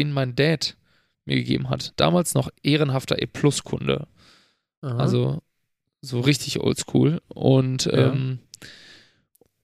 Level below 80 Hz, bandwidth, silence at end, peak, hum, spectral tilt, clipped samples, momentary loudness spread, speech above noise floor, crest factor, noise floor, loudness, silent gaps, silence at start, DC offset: -54 dBFS; 15 kHz; 0.9 s; -4 dBFS; none; -5.5 dB/octave; under 0.1%; 15 LU; 54 dB; 20 dB; -76 dBFS; -23 LUFS; 4.77-4.82 s; 0 s; under 0.1%